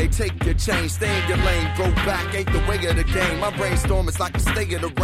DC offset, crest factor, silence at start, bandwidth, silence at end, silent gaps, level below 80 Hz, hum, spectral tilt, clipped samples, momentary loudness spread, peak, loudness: under 0.1%; 14 dB; 0 s; 15.5 kHz; 0 s; none; -26 dBFS; none; -5 dB/octave; under 0.1%; 3 LU; -6 dBFS; -22 LUFS